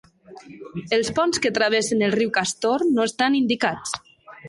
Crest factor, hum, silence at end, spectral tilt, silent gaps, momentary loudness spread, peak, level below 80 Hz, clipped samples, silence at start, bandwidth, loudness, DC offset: 16 dB; none; 0 s; -3.5 dB/octave; none; 12 LU; -6 dBFS; -60 dBFS; under 0.1%; 0.3 s; 11.5 kHz; -21 LUFS; under 0.1%